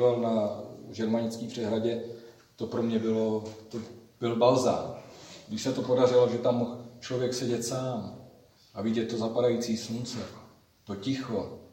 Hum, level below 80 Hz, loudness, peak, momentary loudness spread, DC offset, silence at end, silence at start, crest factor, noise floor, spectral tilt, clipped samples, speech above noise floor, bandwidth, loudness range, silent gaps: none; -68 dBFS; -29 LUFS; -10 dBFS; 18 LU; under 0.1%; 0.05 s; 0 s; 20 dB; -56 dBFS; -5.5 dB/octave; under 0.1%; 28 dB; 16.5 kHz; 5 LU; none